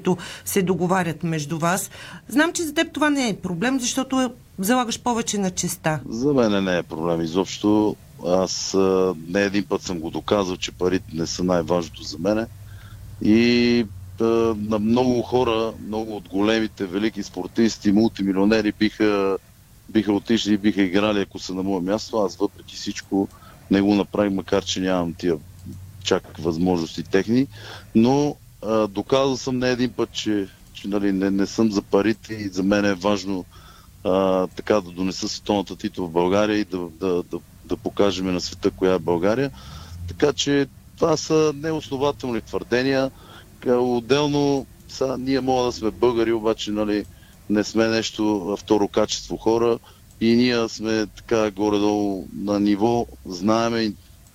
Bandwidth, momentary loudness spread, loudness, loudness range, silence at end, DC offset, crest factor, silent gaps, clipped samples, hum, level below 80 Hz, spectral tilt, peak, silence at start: 16 kHz; 9 LU; -22 LUFS; 2 LU; 0.4 s; under 0.1%; 16 dB; none; under 0.1%; none; -48 dBFS; -5 dB/octave; -6 dBFS; 0 s